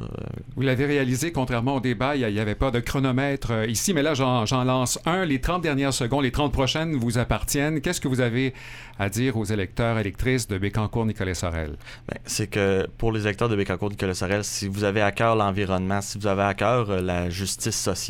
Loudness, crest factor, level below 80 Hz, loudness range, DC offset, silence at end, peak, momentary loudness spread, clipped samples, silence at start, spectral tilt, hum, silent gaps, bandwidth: -24 LUFS; 18 dB; -40 dBFS; 3 LU; under 0.1%; 0 s; -6 dBFS; 5 LU; under 0.1%; 0 s; -5 dB/octave; none; none; 17.5 kHz